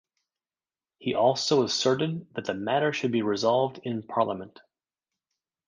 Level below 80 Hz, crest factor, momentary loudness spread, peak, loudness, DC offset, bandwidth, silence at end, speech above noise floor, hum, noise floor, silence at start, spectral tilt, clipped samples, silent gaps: -68 dBFS; 20 dB; 10 LU; -8 dBFS; -26 LUFS; under 0.1%; 10 kHz; 1.2 s; over 64 dB; none; under -90 dBFS; 1 s; -4.5 dB/octave; under 0.1%; none